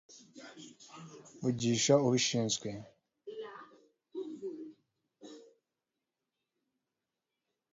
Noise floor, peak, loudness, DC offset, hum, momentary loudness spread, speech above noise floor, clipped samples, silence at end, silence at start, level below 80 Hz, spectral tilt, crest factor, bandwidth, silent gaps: -89 dBFS; -12 dBFS; -32 LUFS; under 0.1%; none; 26 LU; 56 dB; under 0.1%; 2.3 s; 0.1 s; -74 dBFS; -5 dB/octave; 24 dB; 7.6 kHz; none